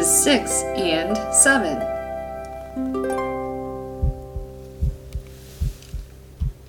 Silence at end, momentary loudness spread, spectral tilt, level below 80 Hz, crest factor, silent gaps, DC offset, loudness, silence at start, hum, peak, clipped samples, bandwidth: 0 s; 21 LU; -3 dB/octave; -32 dBFS; 22 dB; none; under 0.1%; -21 LUFS; 0 s; none; 0 dBFS; under 0.1%; 19 kHz